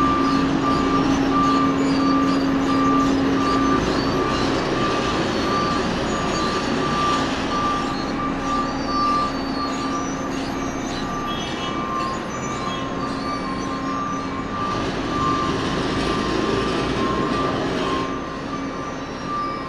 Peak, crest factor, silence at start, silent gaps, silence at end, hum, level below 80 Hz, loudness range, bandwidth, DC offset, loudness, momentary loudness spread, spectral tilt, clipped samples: -8 dBFS; 14 dB; 0 s; none; 0 s; none; -38 dBFS; 6 LU; 12 kHz; under 0.1%; -22 LUFS; 7 LU; -5 dB/octave; under 0.1%